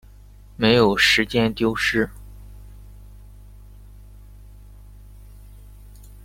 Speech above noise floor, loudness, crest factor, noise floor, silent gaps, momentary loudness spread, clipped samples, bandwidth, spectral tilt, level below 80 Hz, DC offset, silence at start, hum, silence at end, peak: 27 dB; -19 LUFS; 20 dB; -45 dBFS; none; 8 LU; under 0.1%; 16.5 kHz; -4.5 dB/octave; -42 dBFS; under 0.1%; 0.6 s; 50 Hz at -40 dBFS; 0.1 s; -4 dBFS